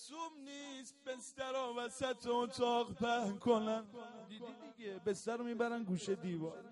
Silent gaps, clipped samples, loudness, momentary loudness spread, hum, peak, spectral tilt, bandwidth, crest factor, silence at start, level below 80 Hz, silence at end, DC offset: none; under 0.1%; -40 LUFS; 15 LU; none; -20 dBFS; -5 dB/octave; 11.5 kHz; 20 dB; 0 s; -76 dBFS; 0 s; under 0.1%